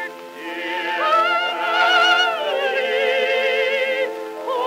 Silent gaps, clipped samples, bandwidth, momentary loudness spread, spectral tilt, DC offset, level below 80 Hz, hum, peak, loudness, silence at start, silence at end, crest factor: none; under 0.1%; 16 kHz; 13 LU; -1 dB/octave; under 0.1%; under -90 dBFS; none; -4 dBFS; -18 LUFS; 0 s; 0 s; 14 dB